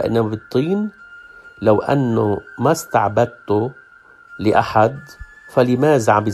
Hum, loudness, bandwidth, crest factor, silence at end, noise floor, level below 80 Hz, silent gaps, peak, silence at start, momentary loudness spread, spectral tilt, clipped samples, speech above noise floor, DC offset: none; -18 LUFS; 14 kHz; 18 dB; 0 s; -46 dBFS; -50 dBFS; none; 0 dBFS; 0 s; 7 LU; -6.5 dB/octave; under 0.1%; 29 dB; under 0.1%